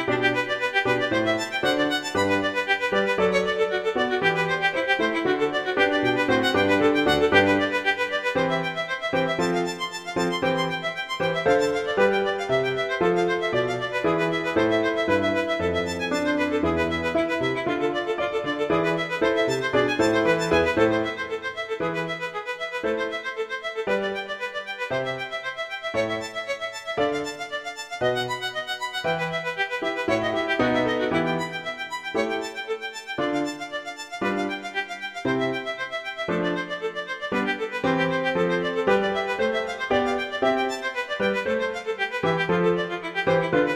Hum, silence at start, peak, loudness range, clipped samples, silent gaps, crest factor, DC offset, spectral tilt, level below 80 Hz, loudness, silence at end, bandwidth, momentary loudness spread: none; 0 s; -6 dBFS; 7 LU; under 0.1%; none; 20 dB; under 0.1%; -5 dB/octave; -54 dBFS; -24 LUFS; 0 s; 15.5 kHz; 8 LU